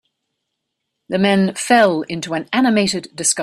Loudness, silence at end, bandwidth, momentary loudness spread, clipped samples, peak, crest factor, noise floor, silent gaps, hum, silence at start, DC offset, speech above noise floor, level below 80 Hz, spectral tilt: -17 LUFS; 0 s; 14 kHz; 10 LU; under 0.1%; 0 dBFS; 18 dB; -76 dBFS; none; none; 1.1 s; under 0.1%; 60 dB; -60 dBFS; -4 dB/octave